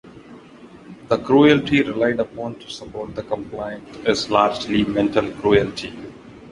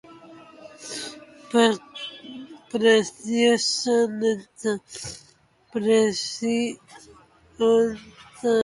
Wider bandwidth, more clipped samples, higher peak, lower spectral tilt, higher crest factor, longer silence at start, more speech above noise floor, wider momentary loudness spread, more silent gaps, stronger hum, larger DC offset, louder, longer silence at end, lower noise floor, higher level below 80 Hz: about the same, 11 kHz vs 11.5 kHz; neither; first, -2 dBFS vs -6 dBFS; first, -5.5 dB/octave vs -3.5 dB/octave; about the same, 18 dB vs 18 dB; about the same, 0.05 s vs 0.1 s; second, 24 dB vs 33 dB; second, 17 LU vs 20 LU; neither; neither; neither; first, -19 LUFS vs -23 LUFS; about the same, 0 s vs 0 s; second, -43 dBFS vs -55 dBFS; first, -48 dBFS vs -64 dBFS